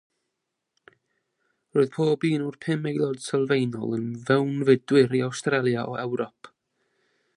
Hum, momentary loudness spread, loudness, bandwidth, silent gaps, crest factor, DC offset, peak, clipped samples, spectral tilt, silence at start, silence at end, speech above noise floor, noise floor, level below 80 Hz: none; 9 LU; -25 LUFS; 11.5 kHz; none; 20 dB; under 0.1%; -6 dBFS; under 0.1%; -6.5 dB/octave; 1.75 s; 0.9 s; 58 dB; -82 dBFS; -70 dBFS